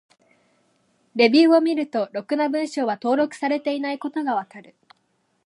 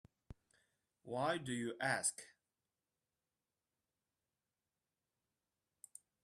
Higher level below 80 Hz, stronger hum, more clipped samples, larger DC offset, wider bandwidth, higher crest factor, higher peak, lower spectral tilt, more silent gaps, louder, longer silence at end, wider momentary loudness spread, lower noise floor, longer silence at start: second, -82 dBFS vs -76 dBFS; neither; neither; neither; second, 11 kHz vs 14 kHz; second, 18 dB vs 24 dB; first, -4 dBFS vs -22 dBFS; first, -4.5 dB/octave vs -3 dB/octave; neither; first, -21 LUFS vs -40 LUFS; second, 0.85 s vs 3.95 s; second, 11 LU vs 22 LU; second, -69 dBFS vs under -90 dBFS; first, 1.15 s vs 0.3 s